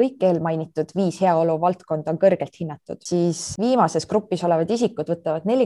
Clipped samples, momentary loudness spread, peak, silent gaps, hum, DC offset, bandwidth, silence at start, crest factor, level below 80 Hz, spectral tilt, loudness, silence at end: under 0.1%; 7 LU; -4 dBFS; none; none; under 0.1%; 12 kHz; 0 s; 16 dB; -60 dBFS; -6 dB/octave; -22 LUFS; 0 s